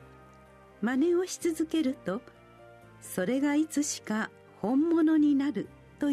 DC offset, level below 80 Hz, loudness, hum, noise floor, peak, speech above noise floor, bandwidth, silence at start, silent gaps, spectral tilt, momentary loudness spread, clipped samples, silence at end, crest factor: under 0.1%; -66 dBFS; -29 LUFS; none; -54 dBFS; -16 dBFS; 27 dB; 13.5 kHz; 0 s; none; -4.5 dB/octave; 13 LU; under 0.1%; 0 s; 12 dB